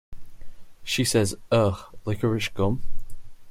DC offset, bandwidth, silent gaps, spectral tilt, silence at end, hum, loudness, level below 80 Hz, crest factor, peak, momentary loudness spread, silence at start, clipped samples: under 0.1%; 16 kHz; none; -5 dB/octave; 0 s; none; -25 LUFS; -40 dBFS; 18 dB; -8 dBFS; 15 LU; 0.1 s; under 0.1%